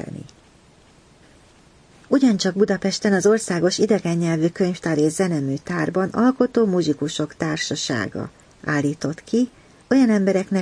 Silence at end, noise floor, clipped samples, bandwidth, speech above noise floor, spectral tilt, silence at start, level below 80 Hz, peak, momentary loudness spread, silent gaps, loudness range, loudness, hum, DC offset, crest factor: 0 s; -52 dBFS; under 0.1%; 10.5 kHz; 32 dB; -5.5 dB/octave; 0 s; -58 dBFS; -4 dBFS; 8 LU; none; 3 LU; -20 LUFS; none; under 0.1%; 16 dB